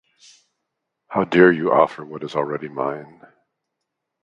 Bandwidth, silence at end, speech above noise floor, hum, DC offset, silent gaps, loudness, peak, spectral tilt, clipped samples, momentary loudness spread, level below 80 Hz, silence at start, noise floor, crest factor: 7.6 kHz; 1.2 s; 61 dB; none; under 0.1%; none; -19 LUFS; 0 dBFS; -7.5 dB/octave; under 0.1%; 13 LU; -60 dBFS; 1.1 s; -80 dBFS; 22 dB